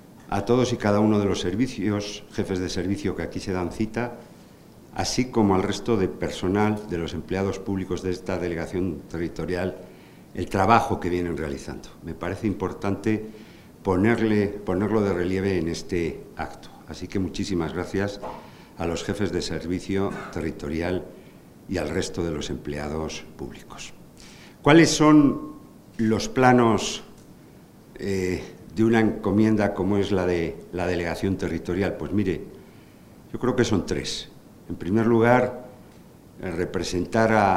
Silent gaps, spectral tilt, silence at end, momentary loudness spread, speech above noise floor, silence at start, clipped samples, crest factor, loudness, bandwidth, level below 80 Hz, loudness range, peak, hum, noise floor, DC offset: none; -6 dB/octave; 0 s; 17 LU; 25 dB; 0.15 s; under 0.1%; 24 dB; -24 LUFS; 16 kHz; -46 dBFS; 8 LU; 0 dBFS; none; -49 dBFS; under 0.1%